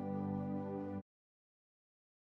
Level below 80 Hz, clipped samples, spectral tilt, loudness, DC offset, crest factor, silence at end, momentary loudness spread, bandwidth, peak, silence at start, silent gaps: -84 dBFS; under 0.1%; -11 dB/octave; -42 LUFS; under 0.1%; 16 dB; 1.2 s; 6 LU; 4.1 kHz; -28 dBFS; 0 s; none